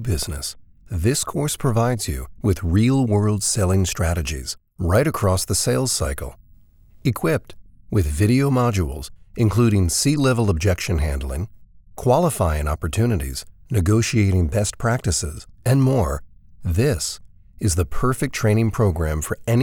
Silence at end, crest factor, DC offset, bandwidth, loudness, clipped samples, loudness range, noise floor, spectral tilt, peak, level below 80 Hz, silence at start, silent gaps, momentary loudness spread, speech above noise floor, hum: 0 s; 16 dB; under 0.1%; 18.5 kHz; -21 LUFS; under 0.1%; 3 LU; -49 dBFS; -5.5 dB/octave; -4 dBFS; -34 dBFS; 0 s; none; 10 LU; 30 dB; none